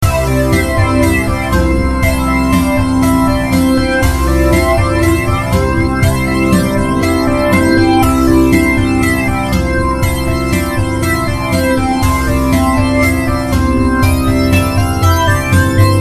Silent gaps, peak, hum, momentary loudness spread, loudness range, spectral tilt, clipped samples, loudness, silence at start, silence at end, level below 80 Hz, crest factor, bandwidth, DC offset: none; 0 dBFS; none; 4 LU; 2 LU; -6 dB/octave; under 0.1%; -12 LUFS; 0 s; 0 s; -20 dBFS; 12 dB; 14 kHz; 0.9%